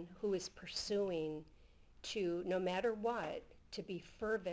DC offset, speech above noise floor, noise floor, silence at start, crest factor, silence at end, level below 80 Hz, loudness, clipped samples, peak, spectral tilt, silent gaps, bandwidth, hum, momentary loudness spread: under 0.1%; 22 dB; -63 dBFS; 0 s; 14 dB; 0 s; -66 dBFS; -41 LUFS; under 0.1%; -26 dBFS; -4.5 dB/octave; none; 8 kHz; none; 12 LU